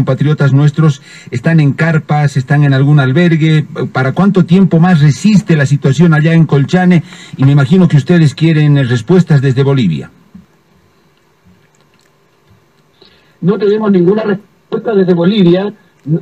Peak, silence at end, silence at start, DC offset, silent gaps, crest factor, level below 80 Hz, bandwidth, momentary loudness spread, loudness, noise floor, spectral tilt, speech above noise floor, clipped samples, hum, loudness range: 0 dBFS; 0 s; 0 s; 0.1%; none; 10 dB; -48 dBFS; 9.2 kHz; 9 LU; -10 LUFS; -51 dBFS; -8 dB/octave; 42 dB; under 0.1%; none; 7 LU